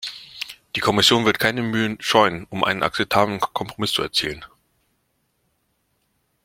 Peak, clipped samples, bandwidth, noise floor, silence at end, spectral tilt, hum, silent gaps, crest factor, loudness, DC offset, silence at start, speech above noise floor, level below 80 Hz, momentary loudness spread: 0 dBFS; under 0.1%; 16.5 kHz; -70 dBFS; 2 s; -3.5 dB/octave; none; none; 22 dB; -20 LUFS; under 0.1%; 0 s; 49 dB; -54 dBFS; 16 LU